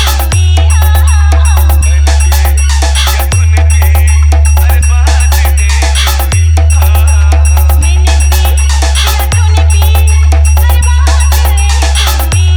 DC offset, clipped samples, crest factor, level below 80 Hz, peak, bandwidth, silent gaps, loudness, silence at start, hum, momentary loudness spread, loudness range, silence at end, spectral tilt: under 0.1%; under 0.1%; 6 dB; -6 dBFS; 0 dBFS; over 20 kHz; none; -8 LUFS; 0 s; none; 2 LU; 0 LU; 0 s; -3.5 dB/octave